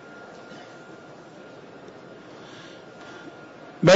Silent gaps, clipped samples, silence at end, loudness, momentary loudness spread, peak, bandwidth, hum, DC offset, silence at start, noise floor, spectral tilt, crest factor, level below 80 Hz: none; under 0.1%; 0 s; -37 LUFS; 3 LU; -6 dBFS; 7.6 kHz; none; under 0.1%; 3.8 s; -45 dBFS; -4.5 dB/octave; 22 dB; -64 dBFS